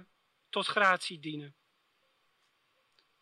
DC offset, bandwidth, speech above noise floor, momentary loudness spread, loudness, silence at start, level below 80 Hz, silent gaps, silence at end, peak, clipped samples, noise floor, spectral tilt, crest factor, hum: under 0.1%; 13 kHz; 43 dB; 15 LU; -30 LUFS; 0.55 s; under -90 dBFS; none; 1.7 s; -12 dBFS; under 0.1%; -74 dBFS; -3 dB/octave; 24 dB; none